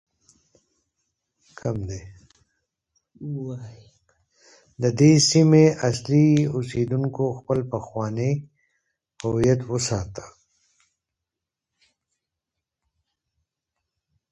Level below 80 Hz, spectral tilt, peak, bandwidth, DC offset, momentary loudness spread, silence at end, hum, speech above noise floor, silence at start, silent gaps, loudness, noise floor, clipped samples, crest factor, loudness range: -52 dBFS; -6 dB/octave; -4 dBFS; 11.5 kHz; under 0.1%; 19 LU; 4.05 s; none; 65 dB; 1.65 s; none; -21 LUFS; -86 dBFS; under 0.1%; 20 dB; 16 LU